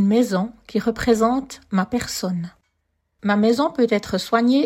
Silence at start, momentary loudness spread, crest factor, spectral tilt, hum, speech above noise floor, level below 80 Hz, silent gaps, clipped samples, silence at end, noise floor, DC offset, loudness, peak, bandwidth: 0 s; 8 LU; 16 dB; -5.5 dB/octave; none; 52 dB; -50 dBFS; none; under 0.1%; 0 s; -72 dBFS; under 0.1%; -21 LUFS; -4 dBFS; 16 kHz